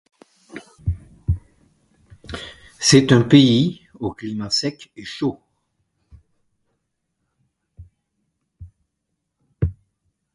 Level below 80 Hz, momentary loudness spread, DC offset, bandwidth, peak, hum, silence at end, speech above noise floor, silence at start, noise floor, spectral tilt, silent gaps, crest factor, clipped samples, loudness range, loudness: -40 dBFS; 23 LU; under 0.1%; 11.5 kHz; 0 dBFS; none; 0.6 s; 60 dB; 0.55 s; -77 dBFS; -5 dB/octave; none; 22 dB; under 0.1%; 17 LU; -19 LUFS